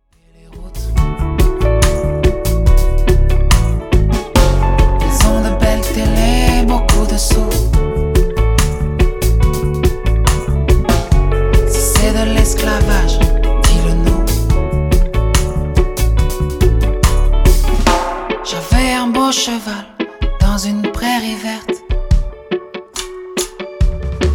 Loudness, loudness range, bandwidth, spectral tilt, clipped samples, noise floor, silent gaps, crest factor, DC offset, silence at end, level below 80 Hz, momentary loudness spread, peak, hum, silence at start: -15 LUFS; 4 LU; 17.5 kHz; -5 dB/octave; under 0.1%; -45 dBFS; none; 12 dB; under 0.1%; 0 s; -14 dBFS; 8 LU; 0 dBFS; none; 0.5 s